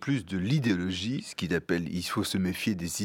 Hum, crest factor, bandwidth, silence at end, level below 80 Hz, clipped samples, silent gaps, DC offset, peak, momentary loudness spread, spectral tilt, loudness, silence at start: none; 18 dB; 17 kHz; 0 s; -56 dBFS; under 0.1%; none; under 0.1%; -12 dBFS; 5 LU; -5 dB/octave; -30 LUFS; 0 s